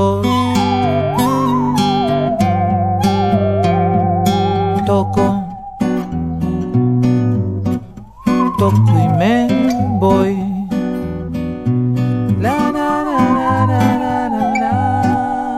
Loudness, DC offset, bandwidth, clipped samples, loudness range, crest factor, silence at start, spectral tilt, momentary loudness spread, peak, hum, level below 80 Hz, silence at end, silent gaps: -15 LUFS; under 0.1%; 15.5 kHz; under 0.1%; 2 LU; 14 dB; 0 s; -7.5 dB/octave; 7 LU; 0 dBFS; none; -40 dBFS; 0 s; none